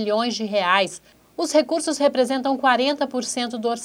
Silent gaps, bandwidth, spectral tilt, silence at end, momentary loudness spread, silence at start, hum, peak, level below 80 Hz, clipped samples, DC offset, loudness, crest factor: none; 16 kHz; -3 dB/octave; 0 s; 8 LU; 0 s; none; -4 dBFS; -68 dBFS; under 0.1%; under 0.1%; -21 LUFS; 18 dB